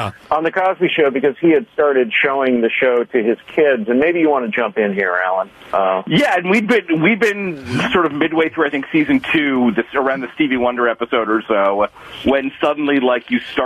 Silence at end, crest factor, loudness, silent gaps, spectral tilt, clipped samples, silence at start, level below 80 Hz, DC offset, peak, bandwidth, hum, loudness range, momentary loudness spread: 0 s; 12 dB; -16 LUFS; none; -6 dB/octave; under 0.1%; 0 s; -52 dBFS; under 0.1%; -4 dBFS; 13 kHz; none; 2 LU; 5 LU